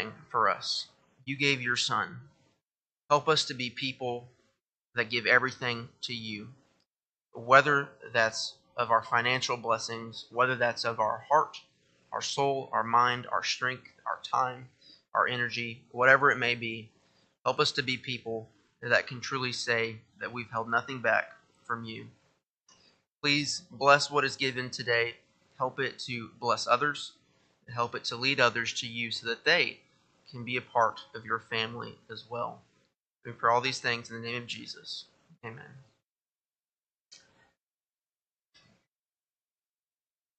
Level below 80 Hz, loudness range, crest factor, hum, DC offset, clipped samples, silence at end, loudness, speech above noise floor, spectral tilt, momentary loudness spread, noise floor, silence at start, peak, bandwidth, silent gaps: -76 dBFS; 6 LU; 28 dB; none; under 0.1%; under 0.1%; 3.25 s; -29 LUFS; over 60 dB; -3 dB/octave; 16 LU; under -90 dBFS; 0 s; -4 dBFS; 9 kHz; 4.69-4.80 s, 6.87-6.91 s, 7.09-7.13 s, 22.49-22.55 s, 23.08-23.18 s, 36.04-36.16 s, 37.01-37.05 s